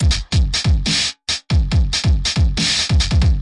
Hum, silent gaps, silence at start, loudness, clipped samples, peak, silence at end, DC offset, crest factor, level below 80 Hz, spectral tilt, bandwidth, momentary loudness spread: none; none; 0 s; -17 LUFS; under 0.1%; -4 dBFS; 0 s; under 0.1%; 12 dB; -20 dBFS; -3.5 dB/octave; 11.5 kHz; 3 LU